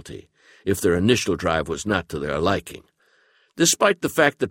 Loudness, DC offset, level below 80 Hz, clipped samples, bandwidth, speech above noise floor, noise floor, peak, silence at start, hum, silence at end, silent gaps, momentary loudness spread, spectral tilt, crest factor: -21 LUFS; under 0.1%; -46 dBFS; under 0.1%; 16.5 kHz; 39 dB; -61 dBFS; -4 dBFS; 0.05 s; none; 0 s; none; 12 LU; -3.5 dB/octave; 20 dB